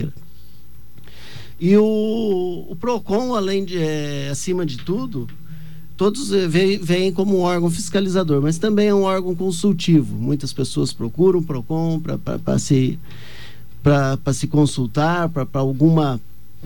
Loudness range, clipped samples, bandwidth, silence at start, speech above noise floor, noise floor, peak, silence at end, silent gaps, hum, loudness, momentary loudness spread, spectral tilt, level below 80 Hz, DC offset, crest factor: 4 LU; under 0.1%; 17 kHz; 0 s; 27 dB; -46 dBFS; -4 dBFS; 0 s; none; none; -19 LUFS; 14 LU; -6.5 dB/octave; -46 dBFS; 3%; 16 dB